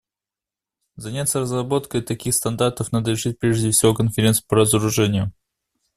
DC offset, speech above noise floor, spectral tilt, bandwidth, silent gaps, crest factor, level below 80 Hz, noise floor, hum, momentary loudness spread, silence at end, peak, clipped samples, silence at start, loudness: under 0.1%; 69 dB; -4.5 dB/octave; 15 kHz; none; 18 dB; -48 dBFS; -89 dBFS; none; 8 LU; 0.65 s; -2 dBFS; under 0.1%; 1 s; -20 LUFS